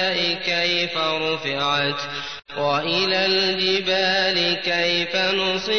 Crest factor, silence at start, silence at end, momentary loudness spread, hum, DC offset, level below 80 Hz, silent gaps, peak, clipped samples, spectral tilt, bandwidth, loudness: 12 dB; 0 s; 0 s; 5 LU; none; 0.4%; -58 dBFS; none; -8 dBFS; under 0.1%; -3.5 dB/octave; 6.6 kHz; -20 LUFS